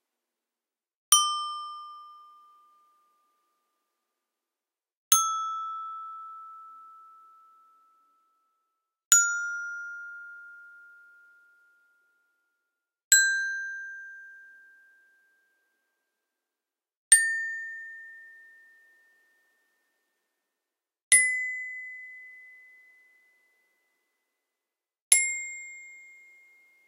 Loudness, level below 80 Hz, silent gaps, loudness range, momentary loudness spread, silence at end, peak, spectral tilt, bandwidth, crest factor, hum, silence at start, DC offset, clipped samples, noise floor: -23 LUFS; under -90 dBFS; 4.97-5.11 s, 9.06-9.11 s, 13.04-13.11 s, 16.97-17.11 s, 21.02-21.11 s, 25.02-25.11 s; 15 LU; 26 LU; 0.85 s; -2 dBFS; 6.5 dB/octave; 16 kHz; 30 dB; none; 1.1 s; under 0.1%; under 0.1%; under -90 dBFS